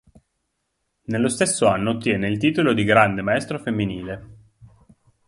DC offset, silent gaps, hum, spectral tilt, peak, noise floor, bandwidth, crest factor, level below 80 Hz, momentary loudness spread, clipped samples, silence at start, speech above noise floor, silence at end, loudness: under 0.1%; none; none; -5 dB/octave; 0 dBFS; -75 dBFS; 11.5 kHz; 22 dB; -52 dBFS; 14 LU; under 0.1%; 1.1 s; 54 dB; 0.6 s; -20 LUFS